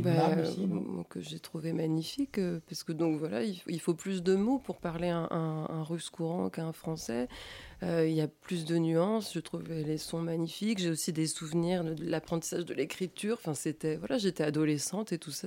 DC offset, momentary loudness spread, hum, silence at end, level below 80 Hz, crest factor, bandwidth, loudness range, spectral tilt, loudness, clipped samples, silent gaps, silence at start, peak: under 0.1%; 9 LU; none; 0 s; -64 dBFS; 18 dB; 16.5 kHz; 2 LU; -5.5 dB/octave; -33 LUFS; under 0.1%; none; 0 s; -16 dBFS